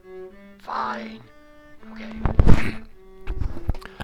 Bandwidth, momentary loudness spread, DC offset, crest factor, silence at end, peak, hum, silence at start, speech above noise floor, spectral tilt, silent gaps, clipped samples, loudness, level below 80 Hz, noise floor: 6 kHz; 23 LU; under 0.1%; 20 dB; 0 s; 0 dBFS; none; 0.1 s; 24 dB; -7.5 dB/octave; none; under 0.1%; -26 LUFS; -26 dBFS; -42 dBFS